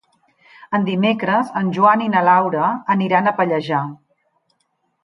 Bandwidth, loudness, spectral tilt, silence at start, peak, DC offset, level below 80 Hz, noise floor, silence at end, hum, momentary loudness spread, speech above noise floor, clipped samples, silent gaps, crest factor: 10.5 kHz; -17 LUFS; -8 dB/octave; 0.6 s; -2 dBFS; under 0.1%; -68 dBFS; -68 dBFS; 1.1 s; none; 8 LU; 52 dB; under 0.1%; none; 18 dB